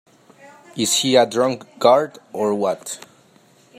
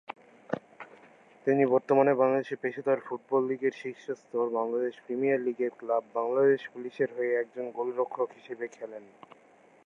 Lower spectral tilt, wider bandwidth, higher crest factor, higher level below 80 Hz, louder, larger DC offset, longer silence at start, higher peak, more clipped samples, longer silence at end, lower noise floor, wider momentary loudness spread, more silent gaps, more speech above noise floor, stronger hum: second, -3 dB/octave vs -7.5 dB/octave; first, 16 kHz vs 7 kHz; about the same, 20 dB vs 20 dB; first, -68 dBFS vs -86 dBFS; first, -19 LUFS vs -29 LUFS; neither; first, 0.75 s vs 0.5 s; first, -2 dBFS vs -10 dBFS; neither; about the same, 0.8 s vs 0.8 s; second, -53 dBFS vs -57 dBFS; about the same, 15 LU vs 15 LU; neither; first, 35 dB vs 28 dB; neither